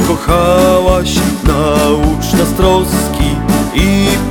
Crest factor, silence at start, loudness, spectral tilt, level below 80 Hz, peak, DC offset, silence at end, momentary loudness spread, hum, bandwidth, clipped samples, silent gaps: 10 dB; 0 s; -11 LUFS; -5.5 dB/octave; -20 dBFS; 0 dBFS; under 0.1%; 0 s; 5 LU; none; 18.5 kHz; under 0.1%; none